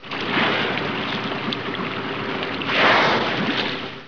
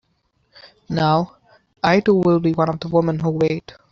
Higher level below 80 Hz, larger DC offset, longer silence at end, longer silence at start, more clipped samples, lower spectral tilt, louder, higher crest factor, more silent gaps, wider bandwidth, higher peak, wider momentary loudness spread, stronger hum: second, -58 dBFS vs -52 dBFS; first, 0.5% vs under 0.1%; second, 0 s vs 0.2 s; second, 0 s vs 0.65 s; neither; second, -5 dB/octave vs -8 dB/octave; about the same, -21 LUFS vs -19 LUFS; about the same, 16 dB vs 16 dB; neither; second, 5.4 kHz vs 7.2 kHz; second, -6 dBFS vs -2 dBFS; about the same, 10 LU vs 8 LU; neither